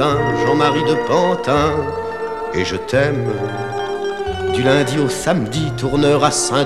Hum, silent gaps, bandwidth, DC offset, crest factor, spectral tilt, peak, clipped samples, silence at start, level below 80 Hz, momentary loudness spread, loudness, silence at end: none; none; 14 kHz; 0.7%; 16 dB; -5 dB/octave; -2 dBFS; under 0.1%; 0 s; -40 dBFS; 8 LU; -17 LUFS; 0 s